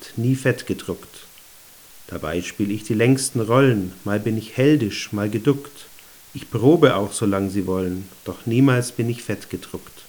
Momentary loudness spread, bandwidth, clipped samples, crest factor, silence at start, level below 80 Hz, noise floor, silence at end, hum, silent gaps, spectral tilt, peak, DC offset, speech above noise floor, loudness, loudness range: 17 LU; over 20 kHz; under 0.1%; 22 dB; 0 s; -56 dBFS; -46 dBFS; 0.05 s; none; none; -6 dB/octave; 0 dBFS; under 0.1%; 26 dB; -21 LUFS; 3 LU